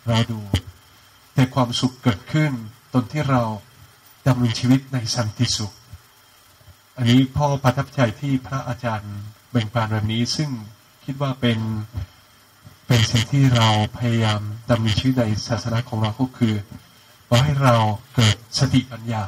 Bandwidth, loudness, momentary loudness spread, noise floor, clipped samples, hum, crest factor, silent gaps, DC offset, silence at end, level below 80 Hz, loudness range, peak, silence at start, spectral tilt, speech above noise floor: 15.5 kHz; -21 LUFS; 11 LU; -52 dBFS; under 0.1%; none; 20 dB; none; under 0.1%; 0 s; -46 dBFS; 5 LU; -2 dBFS; 0.05 s; -5.5 dB/octave; 32 dB